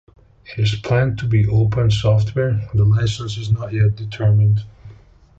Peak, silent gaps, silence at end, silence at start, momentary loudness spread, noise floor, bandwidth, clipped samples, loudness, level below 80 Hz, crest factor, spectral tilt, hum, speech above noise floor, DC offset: -4 dBFS; none; 0.45 s; 0.5 s; 6 LU; -44 dBFS; 7.8 kHz; under 0.1%; -18 LUFS; -36 dBFS; 14 dB; -7 dB/octave; none; 28 dB; under 0.1%